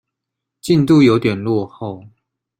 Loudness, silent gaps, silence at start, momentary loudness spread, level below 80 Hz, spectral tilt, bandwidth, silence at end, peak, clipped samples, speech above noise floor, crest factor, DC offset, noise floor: -14 LUFS; none; 0.65 s; 19 LU; -52 dBFS; -7 dB/octave; 15.5 kHz; 0.5 s; -2 dBFS; under 0.1%; 66 dB; 14 dB; under 0.1%; -81 dBFS